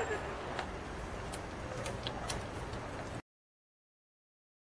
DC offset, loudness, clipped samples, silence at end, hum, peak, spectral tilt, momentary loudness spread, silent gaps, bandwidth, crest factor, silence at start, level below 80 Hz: under 0.1%; -41 LUFS; under 0.1%; 1.45 s; none; -22 dBFS; -4.5 dB/octave; 4 LU; none; 11 kHz; 20 dB; 0 s; -52 dBFS